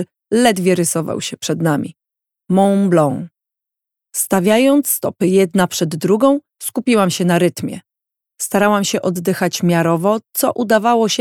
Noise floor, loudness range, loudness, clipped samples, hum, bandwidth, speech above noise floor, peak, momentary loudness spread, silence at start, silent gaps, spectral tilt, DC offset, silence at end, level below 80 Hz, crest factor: -84 dBFS; 3 LU; -16 LUFS; under 0.1%; none; 19 kHz; 69 dB; 0 dBFS; 9 LU; 0 s; none; -5 dB/octave; under 0.1%; 0 s; -60 dBFS; 16 dB